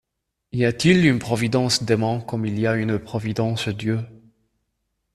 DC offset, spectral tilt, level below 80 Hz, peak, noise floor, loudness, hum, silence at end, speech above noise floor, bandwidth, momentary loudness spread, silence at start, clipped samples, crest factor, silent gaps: under 0.1%; -5.5 dB/octave; -52 dBFS; -2 dBFS; -80 dBFS; -21 LUFS; none; 1 s; 59 dB; 13.5 kHz; 9 LU; 0.55 s; under 0.1%; 20 dB; none